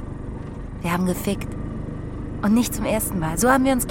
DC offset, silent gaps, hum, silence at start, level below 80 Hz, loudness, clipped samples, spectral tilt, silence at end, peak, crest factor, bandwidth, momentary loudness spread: under 0.1%; none; none; 0 s; -36 dBFS; -23 LUFS; under 0.1%; -5 dB/octave; 0 s; -4 dBFS; 18 dB; 17 kHz; 15 LU